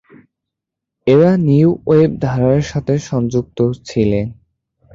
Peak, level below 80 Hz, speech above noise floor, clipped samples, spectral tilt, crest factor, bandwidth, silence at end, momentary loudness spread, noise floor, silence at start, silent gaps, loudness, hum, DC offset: -2 dBFS; -42 dBFS; 68 dB; under 0.1%; -8 dB/octave; 14 dB; 7.6 kHz; 0.6 s; 8 LU; -82 dBFS; 1.05 s; none; -15 LUFS; none; under 0.1%